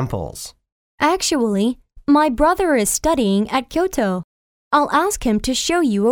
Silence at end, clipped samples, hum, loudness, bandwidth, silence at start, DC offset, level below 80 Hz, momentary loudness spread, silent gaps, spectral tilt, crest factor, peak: 0 s; under 0.1%; none; -18 LUFS; 18.5 kHz; 0 s; under 0.1%; -38 dBFS; 11 LU; 0.72-0.98 s, 4.24-4.71 s; -4 dB/octave; 16 dB; -2 dBFS